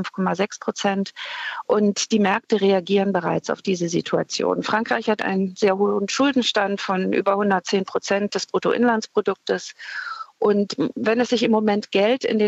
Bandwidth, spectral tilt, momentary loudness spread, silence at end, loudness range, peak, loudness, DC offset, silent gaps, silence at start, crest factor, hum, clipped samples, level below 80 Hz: 8.2 kHz; -4.5 dB/octave; 6 LU; 0 s; 2 LU; -6 dBFS; -21 LUFS; under 0.1%; none; 0 s; 16 dB; none; under 0.1%; -70 dBFS